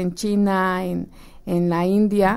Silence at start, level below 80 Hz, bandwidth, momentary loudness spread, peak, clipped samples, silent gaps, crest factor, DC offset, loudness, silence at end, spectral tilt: 0 s; -44 dBFS; 15.5 kHz; 12 LU; -6 dBFS; under 0.1%; none; 14 dB; under 0.1%; -21 LUFS; 0 s; -7 dB/octave